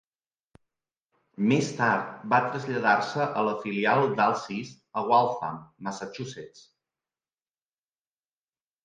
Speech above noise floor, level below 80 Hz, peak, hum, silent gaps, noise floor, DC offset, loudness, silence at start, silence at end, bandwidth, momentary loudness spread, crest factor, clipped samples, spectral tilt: over 64 dB; -74 dBFS; -8 dBFS; none; none; under -90 dBFS; under 0.1%; -26 LUFS; 1.4 s; 2.25 s; 9.6 kHz; 14 LU; 20 dB; under 0.1%; -5.5 dB/octave